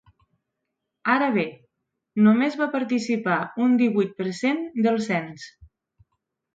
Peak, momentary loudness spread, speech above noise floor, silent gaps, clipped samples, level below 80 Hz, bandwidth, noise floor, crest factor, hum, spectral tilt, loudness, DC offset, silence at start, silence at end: -8 dBFS; 12 LU; 59 dB; none; under 0.1%; -66 dBFS; 7.8 kHz; -81 dBFS; 16 dB; none; -6.5 dB/octave; -23 LUFS; under 0.1%; 1.05 s; 0.9 s